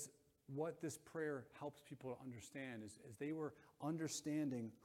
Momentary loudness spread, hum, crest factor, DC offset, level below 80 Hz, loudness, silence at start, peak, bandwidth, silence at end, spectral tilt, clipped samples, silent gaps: 10 LU; none; 16 dB; under 0.1%; -84 dBFS; -48 LUFS; 0 s; -32 dBFS; 16.5 kHz; 0.05 s; -5 dB/octave; under 0.1%; none